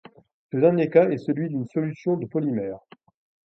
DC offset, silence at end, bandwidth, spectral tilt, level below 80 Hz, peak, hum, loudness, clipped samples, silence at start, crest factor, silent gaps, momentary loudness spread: under 0.1%; 0.65 s; 6.2 kHz; -10 dB/octave; -68 dBFS; -4 dBFS; none; -24 LUFS; under 0.1%; 0.55 s; 20 dB; none; 12 LU